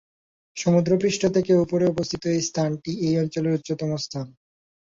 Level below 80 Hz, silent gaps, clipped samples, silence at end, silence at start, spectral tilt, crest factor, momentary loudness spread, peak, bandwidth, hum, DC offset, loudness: -56 dBFS; none; under 0.1%; 0.55 s; 0.55 s; -6 dB/octave; 16 dB; 9 LU; -8 dBFS; 7.6 kHz; none; under 0.1%; -23 LUFS